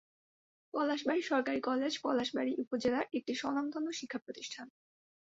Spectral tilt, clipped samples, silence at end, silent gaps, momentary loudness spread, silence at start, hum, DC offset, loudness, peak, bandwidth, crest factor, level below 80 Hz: -2 dB/octave; under 0.1%; 0.55 s; 2.67-2.71 s, 4.22-4.26 s; 11 LU; 0.75 s; none; under 0.1%; -35 LUFS; -18 dBFS; 8 kHz; 18 dB; -74 dBFS